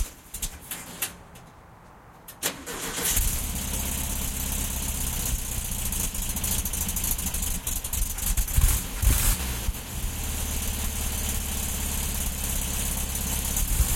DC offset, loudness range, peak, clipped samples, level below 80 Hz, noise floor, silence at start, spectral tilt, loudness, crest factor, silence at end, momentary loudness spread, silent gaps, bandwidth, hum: under 0.1%; 3 LU; -6 dBFS; under 0.1%; -30 dBFS; -49 dBFS; 0 s; -2.5 dB/octave; -28 LUFS; 20 dB; 0 s; 8 LU; none; 17 kHz; none